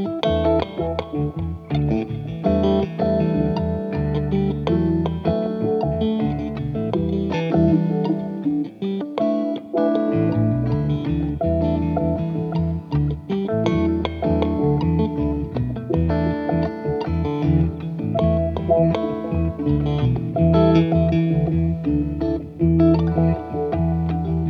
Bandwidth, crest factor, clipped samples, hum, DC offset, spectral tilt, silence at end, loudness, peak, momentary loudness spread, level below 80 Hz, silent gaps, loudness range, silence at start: 6.2 kHz; 16 dB; under 0.1%; none; under 0.1%; -10 dB/octave; 0 s; -21 LUFS; -4 dBFS; 6 LU; -34 dBFS; none; 3 LU; 0 s